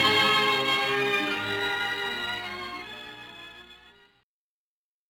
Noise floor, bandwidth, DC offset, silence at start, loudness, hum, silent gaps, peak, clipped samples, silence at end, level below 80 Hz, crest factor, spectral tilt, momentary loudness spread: under -90 dBFS; 18 kHz; under 0.1%; 0 s; -25 LUFS; none; none; -10 dBFS; under 0.1%; 1.35 s; -64 dBFS; 18 dB; -2.5 dB/octave; 21 LU